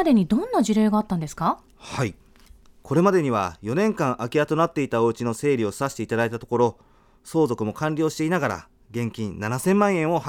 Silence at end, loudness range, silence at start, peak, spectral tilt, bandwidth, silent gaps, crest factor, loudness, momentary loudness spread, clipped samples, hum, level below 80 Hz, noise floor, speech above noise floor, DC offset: 0 s; 2 LU; 0 s; -4 dBFS; -6.5 dB/octave; 17 kHz; none; 18 dB; -23 LUFS; 9 LU; under 0.1%; none; -54 dBFS; -51 dBFS; 28 dB; under 0.1%